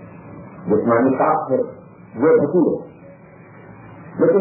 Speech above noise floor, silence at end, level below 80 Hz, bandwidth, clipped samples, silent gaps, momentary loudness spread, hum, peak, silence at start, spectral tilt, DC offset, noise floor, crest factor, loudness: 26 dB; 0 s; -58 dBFS; 2.7 kHz; under 0.1%; none; 23 LU; none; -4 dBFS; 0 s; -13.5 dB/octave; under 0.1%; -43 dBFS; 16 dB; -18 LUFS